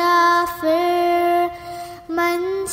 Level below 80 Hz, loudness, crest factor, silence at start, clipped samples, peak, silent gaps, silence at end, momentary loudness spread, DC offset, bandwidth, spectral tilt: -54 dBFS; -18 LUFS; 12 dB; 0 s; under 0.1%; -6 dBFS; none; 0 s; 15 LU; under 0.1%; 16 kHz; -3.5 dB/octave